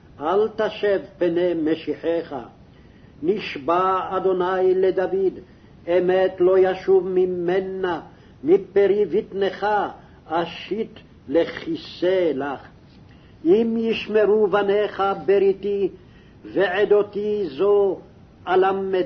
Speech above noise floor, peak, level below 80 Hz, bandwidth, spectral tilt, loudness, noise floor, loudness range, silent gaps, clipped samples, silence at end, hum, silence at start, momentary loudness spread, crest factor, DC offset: 27 dB; -6 dBFS; -56 dBFS; 6.2 kHz; -7.5 dB/octave; -21 LUFS; -48 dBFS; 4 LU; none; under 0.1%; 0 s; none; 0.2 s; 10 LU; 16 dB; under 0.1%